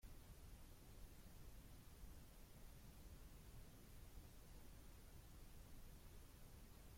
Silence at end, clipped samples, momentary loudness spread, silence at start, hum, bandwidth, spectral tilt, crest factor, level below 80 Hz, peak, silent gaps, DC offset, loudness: 0 s; under 0.1%; 1 LU; 0 s; none; 16.5 kHz; -4.5 dB/octave; 14 dB; -62 dBFS; -46 dBFS; none; under 0.1%; -64 LUFS